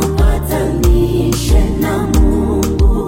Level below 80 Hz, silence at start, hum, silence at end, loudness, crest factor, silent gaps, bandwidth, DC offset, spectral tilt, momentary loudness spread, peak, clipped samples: -14 dBFS; 0 s; none; 0 s; -14 LUFS; 12 dB; none; 16.5 kHz; under 0.1%; -6.5 dB/octave; 3 LU; 0 dBFS; under 0.1%